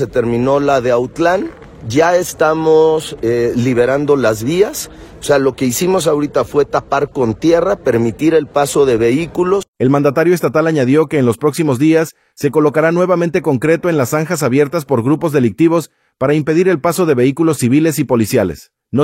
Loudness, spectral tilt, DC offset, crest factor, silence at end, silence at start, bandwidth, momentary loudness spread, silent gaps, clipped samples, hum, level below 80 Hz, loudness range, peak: -14 LUFS; -6 dB/octave; under 0.1%; 12 dB; 0 s; 0 s; 16.5 kHz; 5 LU; 9.68-9.73 s; under 0.1%; none; -44 dBFS; 1 LU; 0 dBFS